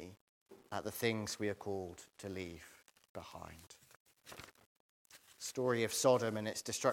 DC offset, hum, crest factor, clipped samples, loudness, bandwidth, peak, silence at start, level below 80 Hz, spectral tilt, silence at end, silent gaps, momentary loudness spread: under 0.1%; none; 24 dB; under 0.1%; -38 LUFS; 17 kHz; -18 dBFS; 0 s; -76 dBFS; -4 dB/octave; 0 s; 0.21-0.46 s, 3.09-3.15 s, 3.96-4.06 s, 4.66-5.05 s; 23 LU